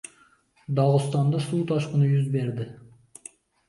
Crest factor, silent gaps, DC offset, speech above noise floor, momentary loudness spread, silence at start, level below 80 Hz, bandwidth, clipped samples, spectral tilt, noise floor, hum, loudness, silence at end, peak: 16 dB; none; under 0.1%; 37 dB; 22 LU; 0.7 s; -66 dBFS; 11.5 kHz; under 0.1%; -7.5 dB/octave; -60 dBFS; none; -24 LUFS; 0.9 s; -8 dBFS